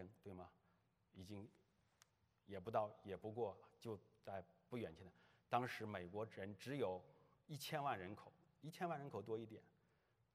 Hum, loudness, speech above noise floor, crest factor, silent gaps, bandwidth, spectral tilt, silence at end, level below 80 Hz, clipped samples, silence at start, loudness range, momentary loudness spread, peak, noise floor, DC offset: none; -50 LUFS; 32 dB; 26 dB; none; 13.5 kHz; -6 dB/octave; 0.65 s; -88 dBFS; under 0.1%; 0 s; 3 LU; 15 LU; -24 dBFS; -81 dBFS; under 0.1%